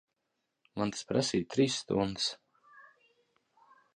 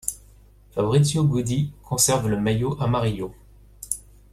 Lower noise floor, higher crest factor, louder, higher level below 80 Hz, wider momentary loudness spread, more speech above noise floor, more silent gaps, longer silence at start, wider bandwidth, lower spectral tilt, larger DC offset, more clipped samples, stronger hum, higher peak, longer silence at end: first, -83 dBFS vs -51 dBFS; about the same, 20 dB vs 18 dB; second, -32 LUFS vs -23 LUFS; second, -64 dBFS vs -46 dBFS; second, 8 LU vs 14 LU; first, 52 dB vs 29 dB; neither; first, 0.75 s vs 0.05 s; second, 10.5 kHz vs 15.5 kHz; about the same, -4.5 dB/octave vs -5 dB/octave; neither; neither; second, none vs 50 Hz at -40 dBFS; second, -14 dBFS vs -4 dBFS; first, 1.15 s vs 0.35 s